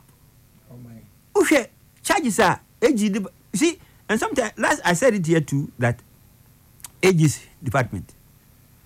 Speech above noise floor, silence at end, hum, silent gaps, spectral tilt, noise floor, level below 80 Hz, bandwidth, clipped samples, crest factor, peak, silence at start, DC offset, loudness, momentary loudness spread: 33 dB; 0.8 s; none; none; -5 dB/octave; -53 dBFS; -54 dBFS; 16 kHz; under 0.1%; 16 dB; -6 dBFS; 0.7 s; under 0.1%; -21 LUFS; 13 LU